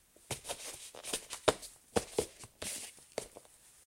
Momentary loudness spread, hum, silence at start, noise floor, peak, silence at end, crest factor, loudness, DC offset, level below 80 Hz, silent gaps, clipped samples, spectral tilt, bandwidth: 15 LU; none; 0.2 s; -59 dBFS; -8 dBFS; 0.15 s; 32 dB; -39 LUFS; under 0.1%; -62 dBFS; none; under 0.1%; -2.5 dB/octave; 16.5 kHz